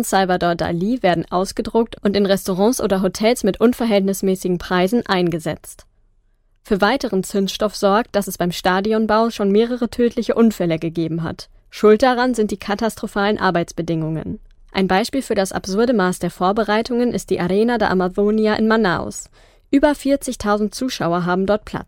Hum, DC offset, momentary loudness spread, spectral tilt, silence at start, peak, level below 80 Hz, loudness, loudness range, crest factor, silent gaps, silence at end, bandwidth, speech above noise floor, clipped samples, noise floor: none; under 0.1%; 6 LU; -5.5 dB/octave; 0 s; -2 dBFS; -44 dBFS; -18 LUFS; 3 LU; 16 dB; none; 0.05 s; 17 kHz; 40 dB; under 0.1%; -58 dBFS